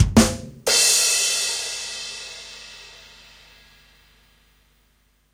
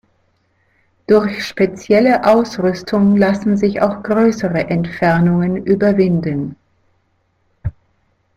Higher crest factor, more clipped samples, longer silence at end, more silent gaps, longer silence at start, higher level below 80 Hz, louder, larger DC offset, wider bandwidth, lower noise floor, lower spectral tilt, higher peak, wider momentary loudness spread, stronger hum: first, 24 dB vs 14 dB; neither; first, 2.45 s vs 0.65 s; neither; second, 0 s vs 1.1 s; first, -38 dBFS vs -46 dBFS; second, -19 LUFS vs -15 LUFS; neither; first, 16.5 kHz vs 7.8 kHz; about the same, -62 dBFS vs -62 dBFS; second, -2.5 dB/octave vs -7.5 dB/octave; about the same, 0 dBFS vs -2 dBFS; first, 24 LU vs 11 LU; first, 50 Hz at -60 dBFS vs none